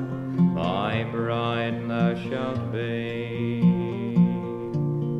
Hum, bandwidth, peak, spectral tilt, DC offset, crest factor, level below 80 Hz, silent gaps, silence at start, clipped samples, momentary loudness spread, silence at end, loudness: none; 5.4 kHz; -10 dBFS; -9 dB/octave; under 0.1%; 14 dB; -56 dBFS; none; 0 s; under 0.1%; 7 LU; 0 s; -25 LUFS